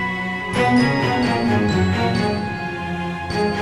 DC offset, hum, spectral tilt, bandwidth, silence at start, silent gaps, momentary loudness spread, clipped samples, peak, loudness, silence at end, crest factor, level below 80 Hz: under 0.1%; none; -6.5 dB/octave; 12.5 kHz; 0 s; none; 9 LU; under 0.1%; -6 dBFS; -20 LUFS; 0 s; 14 dB; -42 dBFS